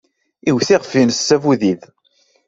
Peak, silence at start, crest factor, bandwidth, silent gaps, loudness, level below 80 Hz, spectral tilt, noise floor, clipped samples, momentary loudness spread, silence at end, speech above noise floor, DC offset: -2 dBFS; 0.45 s; 16 dB; 8 kHz; none; -15 LUFS; -58 dBFS; -4.5 dB/octave; -59 dBFS; under 0.1%; 7 LU; 0.7 s; 44 dB; under 0.1%